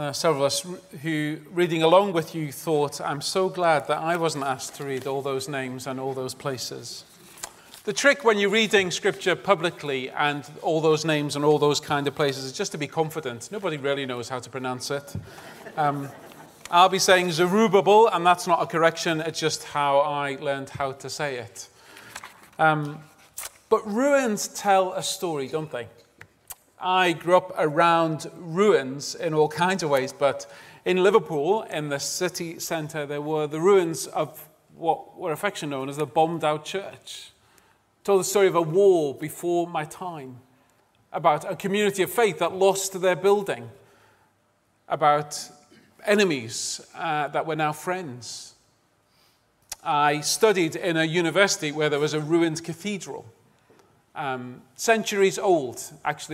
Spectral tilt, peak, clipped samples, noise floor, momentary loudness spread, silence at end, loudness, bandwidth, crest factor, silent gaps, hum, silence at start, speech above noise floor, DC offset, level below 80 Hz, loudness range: -4 dB/octave; -2 dBFS; under 0.1%; -66 dBFS; 16 LU; 0 s; -24 LUFS; 16 kHz; 22 dB; none; none; 0 s; 43 dB; under 0.1%; -68 dBFS; 7 LU